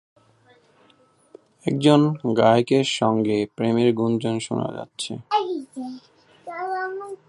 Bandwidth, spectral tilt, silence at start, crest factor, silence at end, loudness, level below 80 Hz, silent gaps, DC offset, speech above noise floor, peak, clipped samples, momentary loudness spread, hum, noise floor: 11 kHz; -6 dB/octave; 1.65 s; 22 dB; 0.15 s; -22 LUFS; -64 dBFS; none; under 0.1%; 38 dB; -2 dBFS; under 0.1%; 16 LU; none; -58 dBFS